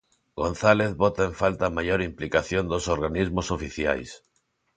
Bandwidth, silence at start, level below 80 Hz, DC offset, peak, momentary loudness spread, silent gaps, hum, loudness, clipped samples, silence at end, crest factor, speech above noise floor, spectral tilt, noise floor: 9.4 kHz; 0.35 s; -42 dBFS; under 0.1%; -2 dBFS; 9 LU; none; none; -25 LUFS; under 0.1%; 0.6 s; 22 dB; 47 dB; -5.5 dB/octave; -72 dBFS